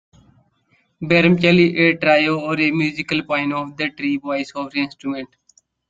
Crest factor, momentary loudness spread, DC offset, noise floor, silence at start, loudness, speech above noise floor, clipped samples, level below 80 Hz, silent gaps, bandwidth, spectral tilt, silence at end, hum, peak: 18 dB; 13 LU; under 0.1%; -63 dBFS; 1 s; -18 LUFS; 44 dB; under 0.1%; -56 dBFS; none; 7.8 kHz; -6.5 dB/octave; 0.65 s; none; -2 dBFS